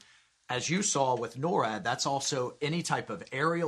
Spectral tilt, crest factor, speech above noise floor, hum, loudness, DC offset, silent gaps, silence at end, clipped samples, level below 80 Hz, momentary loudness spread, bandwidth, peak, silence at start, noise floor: -3.5 dB/octave; 18 dB; 28 dB; none; -30 LUFS; under 0.1%; none; 0 s; under 0.1%; -70 dBFS; 6 LU; 13 kHz; -12 dBFS; 0.5 s; -59 dBFS